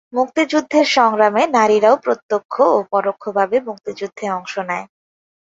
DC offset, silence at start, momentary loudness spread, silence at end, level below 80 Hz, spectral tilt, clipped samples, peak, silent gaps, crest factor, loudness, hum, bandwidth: under 0.1%; 0.15 s; 12 LU; 0.55 s; -66 dBFS; -4 dB/octave; under 0.1%; -2 dBFS; 2.23-2.29 s, 2.45-2.49 s; 16 dB; -17 LUFS; none; 8 kHz